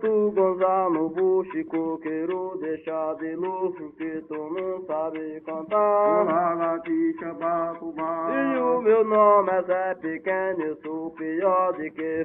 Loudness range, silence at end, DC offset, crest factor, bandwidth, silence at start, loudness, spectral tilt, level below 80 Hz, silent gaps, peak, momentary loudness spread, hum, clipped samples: 7 LU; 0 s; under 0.1%; 18 dB; 3.8 kHz; 0 s; -25 LUFS; -10 dB/octave; -68 dBFS; none; -8 dBFS; 11 LU; none; under 0.1%